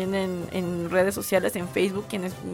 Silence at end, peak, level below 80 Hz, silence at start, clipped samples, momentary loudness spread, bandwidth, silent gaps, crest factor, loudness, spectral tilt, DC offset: 0 s; -10 dBFS; -56 dBFS; 0 s; under 0.1%; 7 LU; 18 kHz; none; 16 dB; -26 LUFS; -5 dB/octave; under 0.1%